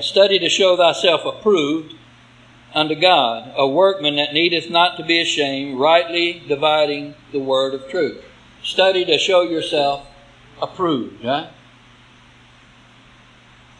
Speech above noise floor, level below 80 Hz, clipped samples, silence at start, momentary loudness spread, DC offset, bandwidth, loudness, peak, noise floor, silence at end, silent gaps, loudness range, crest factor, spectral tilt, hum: 31 dB; -58 dBFS; under 0.1%; 0 s; 11 LU; under 0.1%; 10.5 kHz; -17 LUFS; 0 dBFS; -48 dBFS; 2.3 s; none; 8 LU; 18 dB; -3.5 dB/octave; none